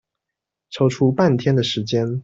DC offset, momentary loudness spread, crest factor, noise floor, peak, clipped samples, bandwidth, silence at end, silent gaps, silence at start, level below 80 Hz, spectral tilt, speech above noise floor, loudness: under 0.1%; 5 LU; 16 dB; -84 dBFS; -4 dBFS; under 0.1%; 7.8 kHz; 0 s; none; 0.7 s; -56 dBFS; -6.5 dB/octave; 66 dB; -19 LUFS